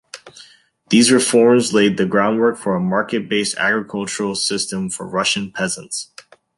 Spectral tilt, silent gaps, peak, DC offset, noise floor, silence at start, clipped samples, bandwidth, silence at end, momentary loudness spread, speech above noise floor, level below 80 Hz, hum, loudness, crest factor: -3.5 dB/octave; none; 0 dBFS; under 0.1%; -48 dBFS; 0.15 s; under 0.1%; 11.5 kHz; 0.55 s; 12 LU; 31 dB; -58 dBFS; none; -17 LUFS; 18 dB